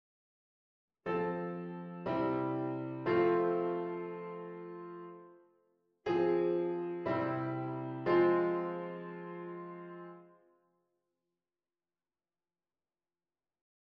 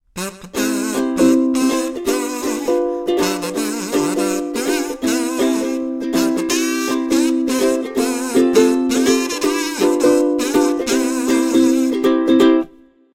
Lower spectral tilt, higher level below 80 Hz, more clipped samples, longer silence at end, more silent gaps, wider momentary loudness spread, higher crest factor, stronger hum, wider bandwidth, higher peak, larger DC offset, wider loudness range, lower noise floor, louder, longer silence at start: first, -9.5 dB/octave vs -3.5 dB/octave; second, -74 dBFS vs -50 dBFS; neither; first, 3.55 s vs 0.45 s; neither; first, 17 LU vs 7 LU; about the same, 20 dB vs 16 dB; neither; second, 5.4 kHz vs 16.5 kHz; second, -18 dBFS vs -2 dBFS; neither; first, 14 LU vs 4 LU; first, under -90 dBFS vs -45 dBFS; second, -35 LUFS vs -17 LUFS; first, 1.05 s vs 0.15 s